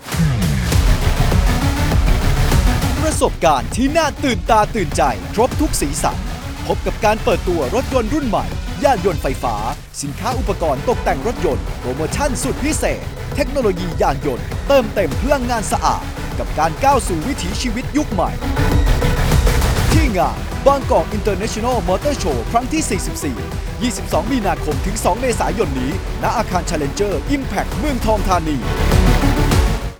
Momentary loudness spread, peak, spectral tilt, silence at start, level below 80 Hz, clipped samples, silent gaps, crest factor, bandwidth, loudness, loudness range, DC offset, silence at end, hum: 7 LU; 0 dBFS; -5.5 dB/octave; 0 s; -22 dBFS; under 0.1%; none; 16 dB; over 20 kHz; -18 LUFS; 3 LU; under 0.1%; 0.05 s; none